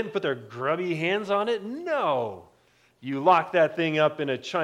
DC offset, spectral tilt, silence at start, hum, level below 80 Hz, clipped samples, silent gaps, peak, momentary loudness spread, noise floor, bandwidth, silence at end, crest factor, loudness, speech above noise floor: under 0.1%; -6 dB/octave; 0 s; none; -74 dBFS; under 0.1%; none; -6 dBFS; 10 LU; -62 dBFS; 11.5 kHz; 0 s; 20 dB; -25 LUFS; 37 dB